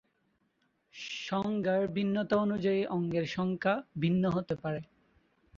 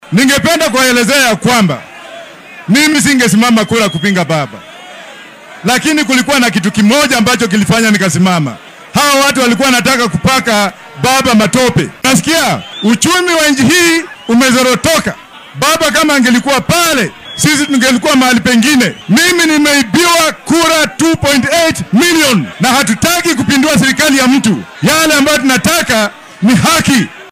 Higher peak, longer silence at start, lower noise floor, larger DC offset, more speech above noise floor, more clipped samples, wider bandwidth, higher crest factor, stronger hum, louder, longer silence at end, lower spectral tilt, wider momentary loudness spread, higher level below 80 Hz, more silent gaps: second, -14 dBFS vs 0 dBFS; first, 0.95 s vs 0.05 s; first, -75 dBFS vs -32 dBFS; neither; first, 44 dB vs 23 dB; neither; second, 7.4 kHz vs 16.5 kHz; first, 18 dB vs 10 dB; neither; second, -32 LUFS vs -9 LUFS; first, 0.75 s vs 0 s; first, -7 dB/octave vs -3.5 dB/octave; about the same, 9 LU vs 7 LU; second, -64 dBFS vs -42 dBFS; neither